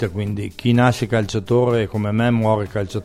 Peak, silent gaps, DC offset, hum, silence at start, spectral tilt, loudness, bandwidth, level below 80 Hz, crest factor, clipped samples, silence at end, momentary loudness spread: -2 dBFS; none; under 0.1%; none; 0 s; -7 dB/octave; -19 LUFS; 14 kHz; -46 dBFS; 16 dB; under 0.1%; 0 s; 8 LU